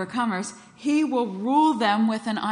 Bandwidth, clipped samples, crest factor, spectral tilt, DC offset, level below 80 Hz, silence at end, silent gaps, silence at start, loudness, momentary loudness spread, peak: 10.5 kHz; under 0.1%; 14 dB; -5 dB/octave; under 0.1%; -72 dBFS; 0 s; none; 0 s; -23 LUFS; 10 LU; -8 dBFS